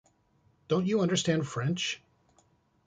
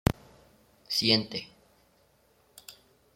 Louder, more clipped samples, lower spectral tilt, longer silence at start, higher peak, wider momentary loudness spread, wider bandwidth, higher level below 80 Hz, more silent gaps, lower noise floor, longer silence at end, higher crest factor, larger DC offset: second, -30 LUFS vs -27 LUFS; neither; about the same, -5 dB/octave vs -4.5 dB/octave; first, 0.7 s vs 0.05 s; second, -14 dBFS vs -6 dBFS; second, 6 LU vs 26 LU; second, 9.6 kHz vs 16.5 kHz; second, -66 dBFS vs -50 dBFS; neither; about the same, -68 dBFS vs -66 dBFS; first, 0.9 s vs 0.45 s; second, 18 dB vs 28 dB; neither